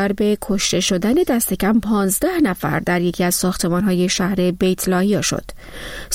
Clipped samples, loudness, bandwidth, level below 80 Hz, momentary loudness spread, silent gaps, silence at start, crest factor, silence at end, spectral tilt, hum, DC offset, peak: under 0.1%; -18 LUFS; 16.5 kHz; -40 dBFS; 4 LU; none; 0 s; 12 dB; 0 s; -4.5 dB/octave; none; 0.2%; -6 dBFS